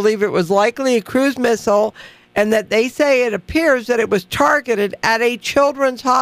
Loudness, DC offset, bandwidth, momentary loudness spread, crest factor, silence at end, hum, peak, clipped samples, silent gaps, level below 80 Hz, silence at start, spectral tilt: -16 LUFS; under 0.1%; 15.5 kHz; 3 LU; 14 dB; 0 s; none; -2 dBFS; under 0.1%; none; -48 dBFS; 0 s; -4 dB/octave